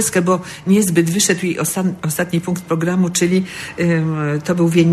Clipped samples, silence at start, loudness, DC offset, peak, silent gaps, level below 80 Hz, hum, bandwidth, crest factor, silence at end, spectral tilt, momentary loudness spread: under 0.1%; 0 s; -17 LUFS; under 0.1%; 0 dBFS; none; -54 dBFS; none; 13 kHz; 16 dB; 0 s; -5 dB/octave; 6 LU